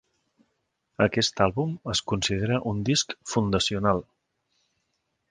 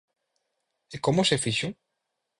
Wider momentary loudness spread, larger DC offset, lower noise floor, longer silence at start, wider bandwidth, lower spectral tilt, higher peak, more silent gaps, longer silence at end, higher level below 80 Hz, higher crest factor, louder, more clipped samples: second, 5 LU vs 12 LU; neither; second, -77 dBFS vs -82 dBFS; about the same, 1 s vs 0.9 s; second, 10 kHz vs 11.5 kHz; about the same, -4.5 dB/octave vs -4 dB/octave; first, -4 dBFS vs -10 dBFS; neither; first, 1.3 s vs 0.65 s; first, -50 dBFS vs -60 dBFS; about the same, 22 dB vs 20 dB; about the same, -25 LUFS vs -26 LUFS; neither